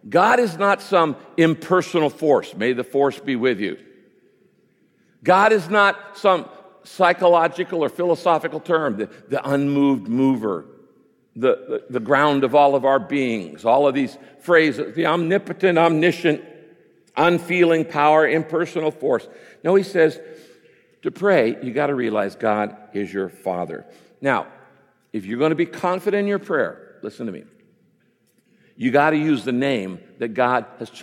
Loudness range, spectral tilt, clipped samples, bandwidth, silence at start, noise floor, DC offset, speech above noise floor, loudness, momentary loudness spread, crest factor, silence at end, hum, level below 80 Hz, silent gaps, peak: 6 LU; -6 dB/octave; under 0.1%; 15.5 kHz; 0.05 s; -63 dBFS; under 0.1%; 43 dB; -20 LUFS; 13 LU; 18 dB; 0 s; none; -72 dBFS; none; -2 dBFS